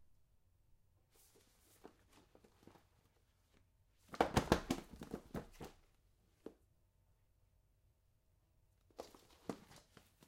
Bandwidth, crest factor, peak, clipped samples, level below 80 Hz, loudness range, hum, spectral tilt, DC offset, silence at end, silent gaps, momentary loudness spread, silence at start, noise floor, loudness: 16 kHz; 36 dB; -12 dBFS; under 0.1%; -62 dBFS; 21 LU; none; -5 dB/octave; under 0.1%; 0.5 s; none; 26 LU; 1.85 s; -76 dBFS; -42 LUFS